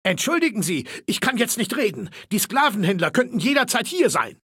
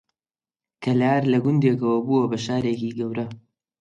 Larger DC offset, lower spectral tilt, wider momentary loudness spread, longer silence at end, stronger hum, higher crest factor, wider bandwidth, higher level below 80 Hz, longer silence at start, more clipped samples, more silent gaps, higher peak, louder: neither; second, -3.5 dB/octave vs -7.5 dB/octave; second, 6 LU vs 10 LU; second, 0.15 s vs 0.4 s; neither; about the same, 18 dB vs 16 dB; first, 17 kHz vs 8 kHz; about the same, -66 dBFS vs -62 dBFS; second, 0.05 s vs 0.8 s; neither; neither; about the same, -4 dBFS vs -6 dBFS; about the same, -21 LUFS vs -22 LUFS